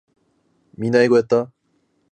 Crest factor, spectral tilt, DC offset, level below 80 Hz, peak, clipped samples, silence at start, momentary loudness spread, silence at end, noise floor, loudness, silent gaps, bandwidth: 18 dB; -6.5 dB/octave; under 0.1%; -64 dBFS; -4 dBFS; under 0.1%; 0.8 s; 13 LU; 0.65 s; -66 dBFS; -18 LUFS; none; 9 kHz